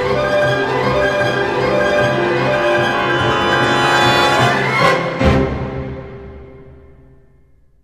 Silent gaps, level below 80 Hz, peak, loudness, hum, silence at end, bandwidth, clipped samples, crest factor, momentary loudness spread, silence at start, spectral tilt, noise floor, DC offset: none; -34 dBFS; -2 dBFS; -14 LUFS; none; 1.1 s; 15 kHz; under 0.1%; 14 dB; 12 LU; 0 s; -5 dB/octave; -51 dBFS; 0.2%